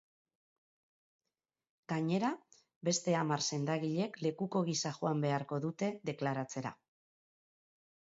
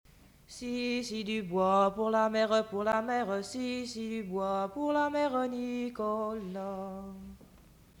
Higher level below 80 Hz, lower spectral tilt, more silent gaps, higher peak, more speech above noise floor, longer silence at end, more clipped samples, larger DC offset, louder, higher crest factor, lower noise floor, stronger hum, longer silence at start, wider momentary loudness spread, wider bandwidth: second, -82 dBFS vs -62 dBFS; about the same, -5.5 dB/octave vs -5 dB/octave; first, 2.76-2.81 s vs none; second, -20 dBFS vs -16 dBFS; first, over 55 dB vs 26 dB; first, 1.45 s vs 0.55 s; neither; neither; second, -36 LUFS vs -32 LUFS; about the same, 18 dB vs 18 dB; first, under -90 dBFS vs -58 dBFS; neither; first, 1.9 s vs 0.5 s; second, 7 LU vs 13 LU; second, 7.6 kHz vs over 20 kHz